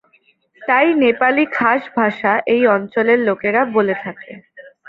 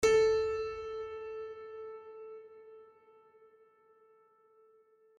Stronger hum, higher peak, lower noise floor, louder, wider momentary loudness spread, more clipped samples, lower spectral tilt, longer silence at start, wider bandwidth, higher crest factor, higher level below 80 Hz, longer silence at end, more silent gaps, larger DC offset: neither; first, -2 dBFS vs -16 dBFS; second, -57 dBFS vs -66 dBFS; first, -16 LUFS vs -34 LUFS; second, 11 LU vs 26 LU; neither; first, -8 dB/octave vs -3 dB/octave; first, 0.6 s vs 0 s; second, 5.2 kHz vs 12 kHz; about the same, 16 dB vs 20 dB; about the same, -62 dBFS vs -62 dBFS; second, 0.25 s vs 2.35 s; neither; neither